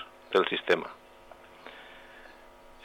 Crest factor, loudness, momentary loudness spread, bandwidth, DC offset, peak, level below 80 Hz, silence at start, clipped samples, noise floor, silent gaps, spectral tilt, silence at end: 20 dB; -28 LUFS; 25 LU; 16 kHz; under 0.1%; -14 dBFS; -64 dBFS; 0 s; under 0.1%; -53 dBFS; none; -4.5 dB/octave; 0.55 s